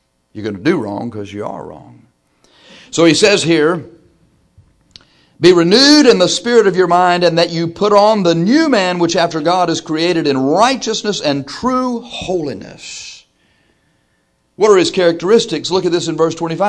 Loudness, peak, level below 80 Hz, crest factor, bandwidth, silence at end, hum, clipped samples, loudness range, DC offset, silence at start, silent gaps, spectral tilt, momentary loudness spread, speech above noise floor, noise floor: -13 LUFS; 0 dBFS; -52 dBFS; 14 dB; 11 kHz; 0 s; none; under 0.1%; 8 LU; under 0.1%; 0.35 s; none; -4.5 dB/octave; 16 LU; 48 dB; -61 dBFS